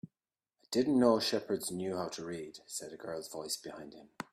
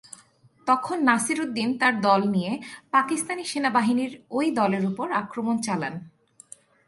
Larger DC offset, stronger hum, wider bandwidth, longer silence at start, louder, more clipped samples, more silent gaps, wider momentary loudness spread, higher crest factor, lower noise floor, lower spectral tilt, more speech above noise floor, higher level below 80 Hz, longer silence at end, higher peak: neither; neither; first, 15.5 kHz vs 11.5 kHz; second, 0.05 s vs 0.65 s; second, -34 LUFS vs -24 LUFS; neither; neither; first, 18 LU vs 8 LU; about the same, 22 dB vs 22 dB; first, under -90 dBFS vs -57 dBFS; about the same, -4 dB/octave vs -4.5 dB/octave; first, over 56 dB vs 33 dB; about the same, -74 dBFS vs -70 dBFS; second, 0.1 s vs 0.8 s; second, -14 dBFS vs -4 dBFS